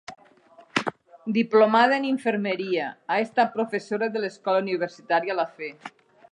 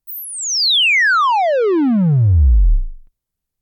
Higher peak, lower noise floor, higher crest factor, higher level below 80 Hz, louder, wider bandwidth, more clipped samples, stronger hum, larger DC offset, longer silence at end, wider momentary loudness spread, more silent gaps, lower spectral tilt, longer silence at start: about the same, -6 dBFS vs -6 dBFS; second, -54 dBFS vs -79 dBFS; first, 20 dB vs 8 dB; second, -78 dBFS vs -20 dBFS; second, -24 LUFS vs -14 LUFS; second, 10.5 kHz vs 17.5 kHz; neither; neither; neither; second, 0.45 s vs 0.65 s; first, 16 LU vs 10 LU; neither; first, -5.5 dB/octave vs -4 dB/octave; about the same, 0.1 s vs 0.1 s